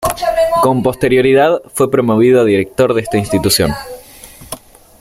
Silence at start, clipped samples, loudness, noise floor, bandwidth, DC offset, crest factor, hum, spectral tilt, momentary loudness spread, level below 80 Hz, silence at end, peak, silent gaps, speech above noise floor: 0 s; under 0.1%; -12 LUFS; -37 dBFS; 16.5 kHz; under 0.1%; 12 dB; none; -5 dB/octave; 20 LU; -38 dBFS; 0.45 s; 0 dBFS; none; 25 dB